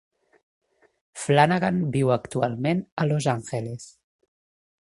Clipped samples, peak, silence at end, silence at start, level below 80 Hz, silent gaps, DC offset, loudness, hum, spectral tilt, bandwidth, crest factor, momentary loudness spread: under 0.1%; -2 dBFS; 1.05 s; 1.15 s; -60 dBFS; 2.92-2.97 s; under 0.1%; -24 LUFS; none; -6 dB/octave; 11.5 kHz; 24 dB; 15 LU